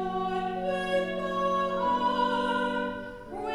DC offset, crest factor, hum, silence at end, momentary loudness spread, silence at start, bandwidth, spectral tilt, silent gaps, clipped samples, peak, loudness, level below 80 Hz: under 0.1%; 12 dB; none; 0 s; 8 LU; 0 s; 13 kHz; -5.5 dB/octave; none; under 0.1%; -16 dBFS; -29 LUFS; -54 dBFS